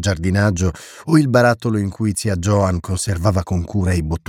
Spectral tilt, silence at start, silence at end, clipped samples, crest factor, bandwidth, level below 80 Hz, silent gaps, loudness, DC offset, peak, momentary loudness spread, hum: -6 dB/octave; 0 s; 0.1 s; under 0.1%; 16 dB; 15 kHz; -34 dBFS; none; -18 LUFS; under 0.1%; -2 dBFS; 7 LU; none